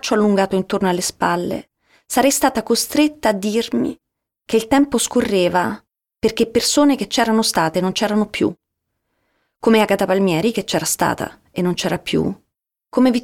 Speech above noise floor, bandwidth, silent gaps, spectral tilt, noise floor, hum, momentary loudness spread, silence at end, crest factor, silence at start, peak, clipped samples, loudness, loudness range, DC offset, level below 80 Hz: 58 dB; 18.5 kHz; none; -4 dB/octave; -75 dBFS; none; 7 LU; 0 s; 16 dB; 0.05 s; -2 dBFS; under 0.1%; -18 LUFS; 2 LU; under 0.1%; -50 dBFS